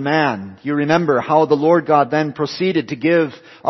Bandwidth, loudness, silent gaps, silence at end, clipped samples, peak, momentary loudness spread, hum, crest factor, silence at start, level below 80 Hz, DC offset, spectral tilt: 6.2 kHz; -17 LUFS; none; 0 s; under 0.1%; 0 dBFS; 8 LU; none; 16 dB; 0 s; -62 dBFS; under 0.1%; -7 dB/octave